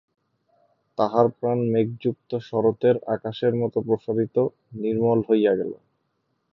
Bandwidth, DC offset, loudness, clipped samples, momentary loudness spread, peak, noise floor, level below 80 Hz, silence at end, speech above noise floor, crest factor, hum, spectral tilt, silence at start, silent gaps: 6 kHz; under 0.1%; -23 LUFS; under 0.1%; 8 LU; -4 dBFS; -73 dBFS; -64 dBFS; 0.8 s; 51 dB; 20 dB; none; -9.5 dB/octave; 1 s; none